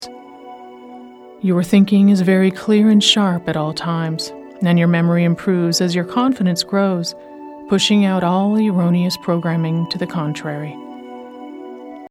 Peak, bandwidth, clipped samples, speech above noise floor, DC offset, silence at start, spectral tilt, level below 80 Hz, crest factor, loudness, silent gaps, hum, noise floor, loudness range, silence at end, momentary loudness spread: 0 dBFS; 14 kHz; under 0.1%; 22 dB; under 0.1%; 0 s; -5.5 dB/octave; -58 dBFS; 16 dB; -16 LUFS; none; none; -38 dBFS; 4 LU; 0.05 s; 21 LU